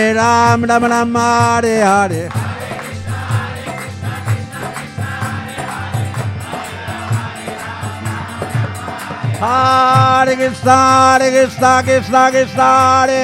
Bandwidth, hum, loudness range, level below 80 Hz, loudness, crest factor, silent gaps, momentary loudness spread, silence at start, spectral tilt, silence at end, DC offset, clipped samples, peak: 16.5 kHz; none; 12 LU; -48 dBFS; -14 LUFS; 14 dB; none; 15 LU; 0 s; -5 dB/octave; 0 s; under 0.1%; under 0.1%; 0 dBFS